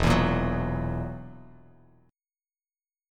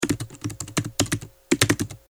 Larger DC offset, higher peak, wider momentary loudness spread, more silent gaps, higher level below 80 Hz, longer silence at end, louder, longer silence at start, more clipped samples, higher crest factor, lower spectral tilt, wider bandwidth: neither; second, -10 dBFS vs 0 dBFS; first, 18 LU vs 11 LU; neither; first, -38 dBFS vs -48 dBFS; first, 1.65 s vs 0.15 s; second, -28 LUFS vs -25 LUFS; about the same, 0 s vs 0 s; neither; second, 20 dB vs 26 dB; first, -6.5 dB/octave vs -3.5 dB/octave; second, 14.5 kHz vs over 20 kHz